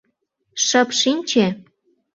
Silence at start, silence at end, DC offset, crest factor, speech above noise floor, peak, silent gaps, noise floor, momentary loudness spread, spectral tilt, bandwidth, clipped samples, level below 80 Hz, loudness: 0.55 s; 0.55 s; under 0.1%; 20 dB; 52 dB; -2 dBFS; none; -70 dBFS; 14 LU; -2.5 dB/octave; 8 kHz; under 0.1%; -64 dBFS; -18 LUFS